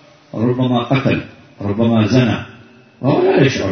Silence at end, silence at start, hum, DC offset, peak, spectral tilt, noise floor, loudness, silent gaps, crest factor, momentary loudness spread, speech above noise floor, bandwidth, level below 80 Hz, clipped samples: 0 s; 0.35 s; none; under 0.1%; 0 dBFS; -7 dB/octave; -43 dBFS; -16 LUFS; none; 16 dB; 14 LU; 28 dB; 6.6 kHz; -48 dBFS; under 0.1%